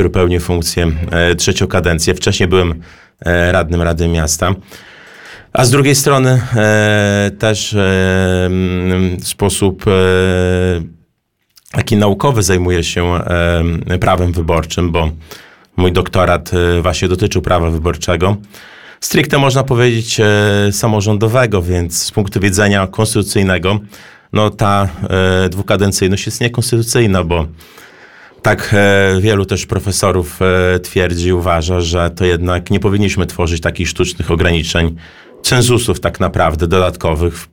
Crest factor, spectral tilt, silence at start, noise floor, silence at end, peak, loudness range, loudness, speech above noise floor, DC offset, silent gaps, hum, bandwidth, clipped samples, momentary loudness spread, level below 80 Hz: 12 dB; -5 dB/octave; 0 s; -64 dBFS; 0.1 s; 0 dBFS; 2 LU; -13 LUFS; 51 dB; 1%; none; none; 18 kHz; under 0.1%; 6 LU; -28 dBFS